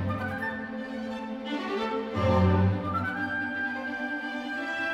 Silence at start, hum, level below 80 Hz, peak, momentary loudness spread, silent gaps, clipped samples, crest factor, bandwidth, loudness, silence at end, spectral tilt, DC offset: 0 s; none; -54 dBFS; -12 dBFS; 11 LU; none; under 0.1%; 18 dB; 8.2 kHz; -29 LUFS; 0 s; -7.5 dB/octave; under 0.1%